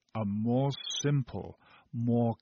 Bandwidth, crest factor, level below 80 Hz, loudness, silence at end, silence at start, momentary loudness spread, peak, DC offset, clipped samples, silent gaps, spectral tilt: 6.8 kHz; 14 dB; -64 dBFS; -31 LUFS; 0.05 s; 0.15 s; 14 LU; -18 dBFS; under 0.1%; under 0.1%; none; -6.5 dB/octave